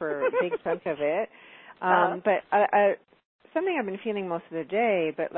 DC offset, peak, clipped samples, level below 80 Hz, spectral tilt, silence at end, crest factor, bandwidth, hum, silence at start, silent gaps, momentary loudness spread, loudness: under 0.1%; -8 dBFS; under 0.1%; -76 dBFS; -9.5 dB/octave; 0 s; 18 dB; 4 kHz; none; 0 s; 3.25-3.39 s; 9 LU; -26 LUFS